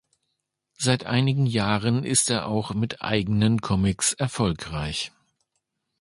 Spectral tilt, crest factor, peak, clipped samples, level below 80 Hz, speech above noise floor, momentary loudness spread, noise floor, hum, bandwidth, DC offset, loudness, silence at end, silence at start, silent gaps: -4.5 dB/octave; 20 dB; -4 dBFS; under 0.1%; -46 dBFS; 56 dB; 8 LU; -79 dBFS; none; 11.5 kHz; under 0.1%; -24 LUFS; 0.9 s; 0.8 s; none